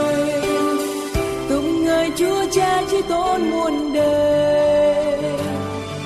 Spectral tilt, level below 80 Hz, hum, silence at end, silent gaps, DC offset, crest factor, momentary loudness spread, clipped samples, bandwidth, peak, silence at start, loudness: -5 dB/octave; -40 dBFS; none; 0 s; none; under 0.1%; 14 dB; 7 LU; under 0.1%; 14 kHz; -4 dBFS; 0 s; -19 LUFS